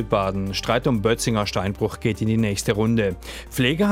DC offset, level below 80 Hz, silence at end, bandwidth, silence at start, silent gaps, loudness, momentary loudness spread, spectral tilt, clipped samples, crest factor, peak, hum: under 0.1%; -40 dBFS; 0 s; 16 kHz; 0 s; none; -22 LUFS; 5 LU; -5.5 dB/octave; under 0.1%; 16 dB; -6 dBFS; none